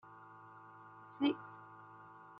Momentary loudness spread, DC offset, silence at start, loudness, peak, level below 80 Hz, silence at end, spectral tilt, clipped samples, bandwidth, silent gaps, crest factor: 20 LU; under 0.1%; 0.05 s; -38 LUFS; -22 dBFS; -86 dBFS; 0 s; -3.5 dB/octave; under 0.1%; 5.2 kHz; none; 22 dB